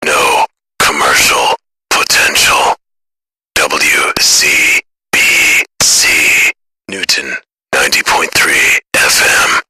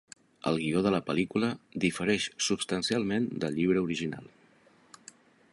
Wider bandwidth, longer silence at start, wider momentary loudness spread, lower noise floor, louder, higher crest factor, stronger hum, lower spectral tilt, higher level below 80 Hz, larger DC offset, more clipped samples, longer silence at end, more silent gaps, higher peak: first, 14.5 kHz vs 11.5 kHz; second, 0 s vs 0.45 s; first, 10 LU vs 5 LU; first, -81 dBFS vs -62 dBFS; first, -8 LUFS vs -30 LUFS; second, 12 dB vs 18 dB; neither; second, 0.5 dB/octave vs -4.5 dB/octave; first, -42 dBFS vs -62 dBFS; neither; neither; second, 0.1 s vs 1.25 s; neither; first, 0 dBFS vs -12 dBFS